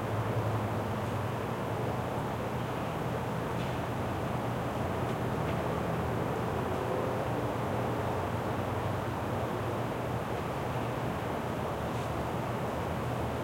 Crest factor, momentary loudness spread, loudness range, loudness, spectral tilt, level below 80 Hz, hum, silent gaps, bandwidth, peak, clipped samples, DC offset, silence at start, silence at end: 14 dB; 2 LU; 1 LU; -33 LUFS; -6.5 dB/octave; -52 dBFS; none; none; 16.5 kHz; -20 dBFS; under 0.1%; under 0.1%; 0 s; 0 s